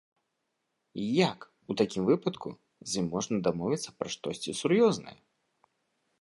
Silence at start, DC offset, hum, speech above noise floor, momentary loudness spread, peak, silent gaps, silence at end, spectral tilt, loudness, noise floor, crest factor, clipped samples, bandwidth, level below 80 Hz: 0.95 s; under 0.1%; none; 52 dB; 18 LU; -10 dBFS; none; 1.1 s; -5 dB/octave; -30 LUFS; -81 dBFS; 22 dB; under 0.1%; 11.5 kHz; -66 dBFS